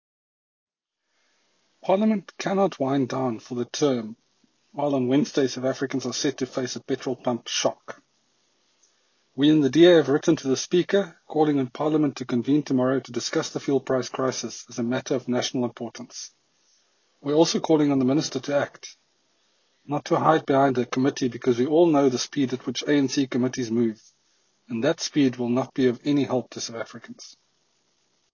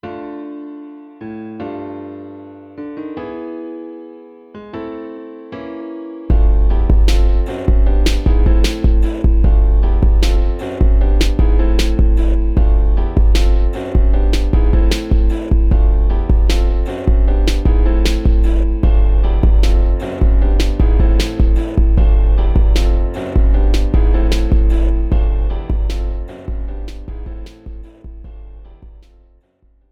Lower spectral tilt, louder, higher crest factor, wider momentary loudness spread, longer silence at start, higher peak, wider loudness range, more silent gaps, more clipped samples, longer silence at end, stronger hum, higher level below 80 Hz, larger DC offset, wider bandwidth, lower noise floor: second, -5 dB/octave vs -7 dB/octave; second, -24 LUFS vs -16 LUFS; first, 20 dB vs 12 dB; second, 13 LU vs 17 LU; first, 1.85 s vs 0.05 s; second, -4 dBFS vs 0 dBFS; second, 6 LU vs 14 LU; neither; neither; about the same, 1.05 s vs 1 s; neither; second, -70 dBFS vs -14 dBFS; neither; about the same, 7.4 kHz vs 7.8 kHz; first, -79 dBFS vs -54 dBFS